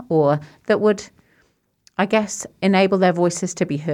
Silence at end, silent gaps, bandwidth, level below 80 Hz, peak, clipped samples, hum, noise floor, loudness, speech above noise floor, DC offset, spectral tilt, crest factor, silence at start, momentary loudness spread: 0 s; none; 12.5 kHz; -62 dBFS; -4 dBFS; under 0.1%; none; -63 dBFS; -19 LUFS; 44 dB; under 0.1%; -5.5 dB/octave; 16 dB; 0 s; 9 LU